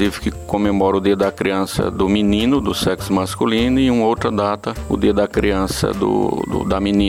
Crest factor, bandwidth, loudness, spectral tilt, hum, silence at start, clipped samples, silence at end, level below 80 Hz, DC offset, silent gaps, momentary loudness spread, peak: 14 dB; 16 kHz; -18 LUFS; -6 dB/octave; none; 0 s; under 0.1%; 0 s; -34 dBFS; under 0.1%; none; 5 LU; -4 dBFS